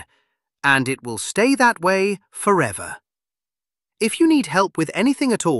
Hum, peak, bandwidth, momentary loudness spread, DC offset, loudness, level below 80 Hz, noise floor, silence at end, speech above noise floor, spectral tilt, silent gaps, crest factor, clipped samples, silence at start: none; -2 dBFS; 12.5 kHz; 9 LU; under 0.1%; -19 LUFS; -62 dBFS; under -90 dBFS; 0 s; over 71 dB; -4.5 dB/octave; none; 18 dB; under 0.1%; 0 s